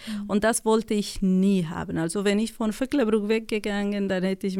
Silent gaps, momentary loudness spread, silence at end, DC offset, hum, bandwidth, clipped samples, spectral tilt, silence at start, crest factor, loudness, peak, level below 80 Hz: none; 6 LU; 0 s; under 0.1%; none; 16 kHz; under 0.1%; -5.5 dB/octave; 0 s; 14 dB; -25 LUFS; -10 dBFS; -48 dBFS